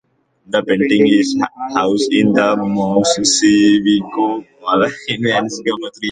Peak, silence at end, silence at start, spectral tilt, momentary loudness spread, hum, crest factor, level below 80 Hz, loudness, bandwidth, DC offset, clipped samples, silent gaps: 0 dBFS; 0 s; 0.5 s; -4 dB/octave; 9 LU; none; 14 dB; -54 dBFS; -15 LUFS; 9.4 kHz; under 0.1%; under 0.1%; none